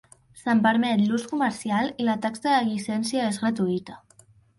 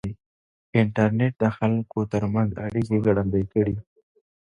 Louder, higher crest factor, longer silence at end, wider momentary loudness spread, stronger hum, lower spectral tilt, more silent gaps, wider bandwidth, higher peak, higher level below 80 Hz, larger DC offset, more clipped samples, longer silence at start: about the same, -24 LUFS vs -24 LUFS; about the same, 16 dB vs 18 dB; second, 0.6 s vs 0.8 s; about the same, 7 LU vs 5 LU; neither; second, -5 dB/octave vs -9 dB/octave; second, none vs 0.26-0.73 s; first, 11.5 kHz vs 9.6 kHz; about the same, -8 dBFS vs -6 dBFS; second, -66 dBFS vs -48 dBFS; neither; neither; first, 0.35 s vs 0.05 s